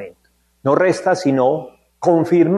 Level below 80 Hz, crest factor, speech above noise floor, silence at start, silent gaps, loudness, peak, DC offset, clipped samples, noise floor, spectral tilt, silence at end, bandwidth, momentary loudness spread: -64 dBFS; 16 dB; 46 dB; 0 s; none; -17 LUFS; 0 dBFS; under 0.1%; under 0.1%; -60 dBFS; -7 dB/octave; 0 s; 11.5 kHz; 10 LU